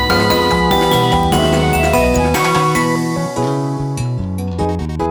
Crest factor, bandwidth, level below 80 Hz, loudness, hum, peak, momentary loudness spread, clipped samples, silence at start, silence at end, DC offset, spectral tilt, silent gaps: 14 dB; over 20 kHz; -28 dBFS; -15 LUFS; none; 0 dBFS; 7 LU; under 0.1%; 0 s; 0 s; under 0.1%; -5 dB/octave; none